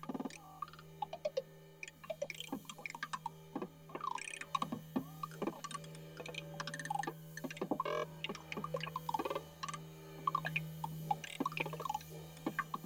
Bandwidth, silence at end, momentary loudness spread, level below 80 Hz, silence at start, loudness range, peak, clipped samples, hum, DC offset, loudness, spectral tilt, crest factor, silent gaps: over 20 kHz; 0 s; 9 LU; -72 dBFS; 0 s; 4 LU; -22 dBFS; under 0.1%; none; under 0.1%; -43 LUFS; -4.5 dB/octave; 22 dB; none